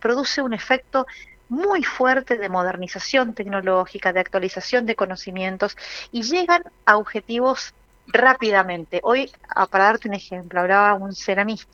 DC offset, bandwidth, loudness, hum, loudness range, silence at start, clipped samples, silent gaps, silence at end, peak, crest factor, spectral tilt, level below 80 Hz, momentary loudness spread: under 0.1%; 7.4 kHz; -21 LUFS; none; 3 LU; 0 s; under 0.1%; none; 0.1 s; 0 dBFS; 20 dB; -4 dB/octave; -56 dBFS; 10 LU